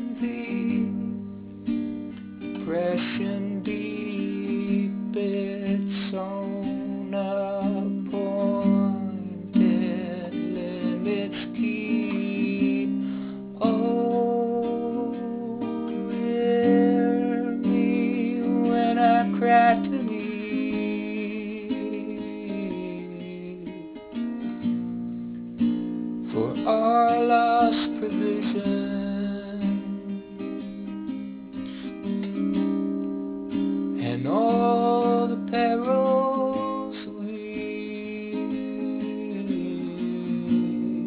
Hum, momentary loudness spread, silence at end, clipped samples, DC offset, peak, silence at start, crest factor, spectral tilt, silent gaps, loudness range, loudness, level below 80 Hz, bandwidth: none; 13 LU; 0 s; under 0.1%; under 0.1%; -8 dBFS; 0 s; 18 dB; -11 dB/octave; none; 8 LU; -26 LUFS; -60 dBFS; 4 kHz